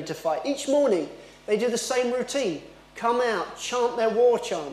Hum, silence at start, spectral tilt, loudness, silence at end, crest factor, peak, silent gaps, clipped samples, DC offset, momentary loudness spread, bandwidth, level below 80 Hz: none; 0 s; -3.5 dB/octave; -25 LUFS; 0 s; 14 dB; -10 dBFS; none; under 0.1%; under 0.1%; 8 LU; 14.5 kHz; -62 dBFS